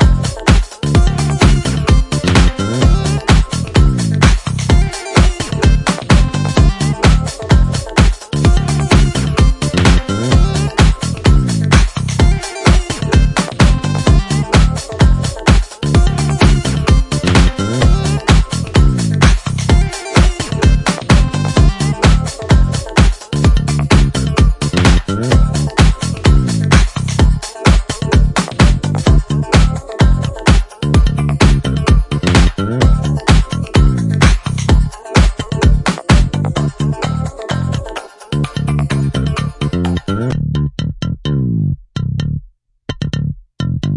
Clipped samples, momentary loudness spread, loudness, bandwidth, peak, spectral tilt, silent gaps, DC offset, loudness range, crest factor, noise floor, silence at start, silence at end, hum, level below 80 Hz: under 0.1%; 6 LU; -14 LUFS; 11.5 kHz; 0 dBFS; -5.5 dB/octave; none; under 0.1%; 5 LU; 12 dB; -41 dBFS; 0 s; 0 s; none; -16 dBFS